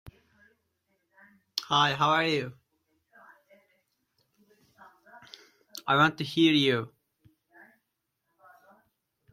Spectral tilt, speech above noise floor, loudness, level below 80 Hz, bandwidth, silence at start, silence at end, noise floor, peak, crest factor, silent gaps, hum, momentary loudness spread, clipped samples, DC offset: -5 dB/octave; 56 dB; -25 LUFS; -70 dBFS; 15.5 kHz; 0.05 s; 2.45 s; -81 dBFS; -8 dBFS; 24 dB; none; none; 22 LU; under 0.1%; under 0.1%